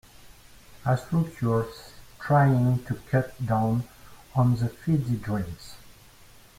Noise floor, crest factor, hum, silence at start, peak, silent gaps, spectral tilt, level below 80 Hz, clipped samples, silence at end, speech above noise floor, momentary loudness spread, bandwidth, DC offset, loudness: -52 dBFS; 18 dB; none; 0.25 s; -8 dBFS; none; -8 dB/octave; -52 dBFS; under 0.1%; 0.7 s; 27 dB; 16 LU; 16 kHz; under 0.1%; -26 LUFS